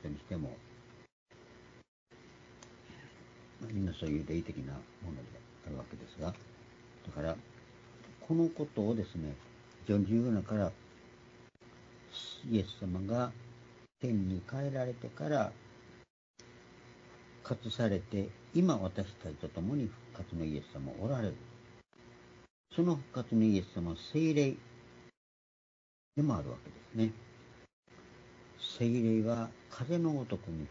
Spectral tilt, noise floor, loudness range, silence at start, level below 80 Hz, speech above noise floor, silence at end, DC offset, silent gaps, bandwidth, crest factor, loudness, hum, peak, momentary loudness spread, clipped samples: -7 dB/octave; -59 dBFS; 8 LU; 0 s; -60 dBFS; 24 dB; 0 s; under 0.1%; 1.12-1.26 s, 1.88-2.07 s, 16.10-16.34 s, 22.50-22.64 s, 25.17-26.12 s, 27.73-27.83 s; 7.4 kHz; 20 dB; -36 LUFS; none; -18 dBFS; 25 LU; under 0.1%